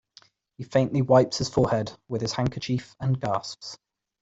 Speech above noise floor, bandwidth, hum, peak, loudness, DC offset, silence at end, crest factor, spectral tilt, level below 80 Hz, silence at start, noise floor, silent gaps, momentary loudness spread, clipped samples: 33 dB; 8 kHz; none; -6 dBFS; -25 LUFS; under 0.1%; 0.45 s; 20 dB; -6 dB/octave; -54 dBFS; 0.6 s; -57 dBFS; none; 18 LU; under 0.1%